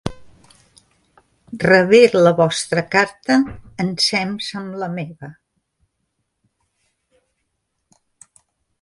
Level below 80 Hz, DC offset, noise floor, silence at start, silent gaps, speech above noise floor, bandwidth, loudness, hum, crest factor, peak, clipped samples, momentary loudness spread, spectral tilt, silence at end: -52 dBFS; under 0.1%; -73 dBFS; 0.05 s; none; 57 dB; 11.5 kHz; -16 LUFS; none; 20 dB; 0 dBFS; under 0.1%; 20 LU; -4.5 dB/octave; 3.5 s